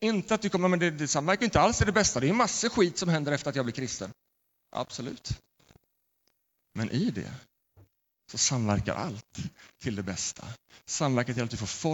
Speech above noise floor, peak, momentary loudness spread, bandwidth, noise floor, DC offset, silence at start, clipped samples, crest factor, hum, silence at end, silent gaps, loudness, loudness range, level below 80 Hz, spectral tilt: 48 dB; -10 dBFS; 16 LU; 17.5 kHz; -76 dBFS; under 0.1%; 0 s; under 0.1%; 20 dB; none; 0 s; none; -28 LUFS; 12 LU; -50 dBFS; -4 dB/octave